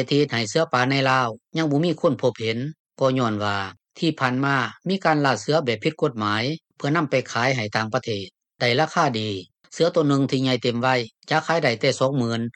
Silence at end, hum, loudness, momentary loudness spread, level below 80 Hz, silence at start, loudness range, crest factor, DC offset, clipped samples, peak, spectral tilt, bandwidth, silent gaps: 0.05 s; none; -22 LUFS; 7 LU; -66 dBFS; 0 s; 2 LU; 16 dB; under 0.1%; under 0.1%; -6 dBFS; -5.5 dB/octave; 9.4 kHz; 2.80-2.85 s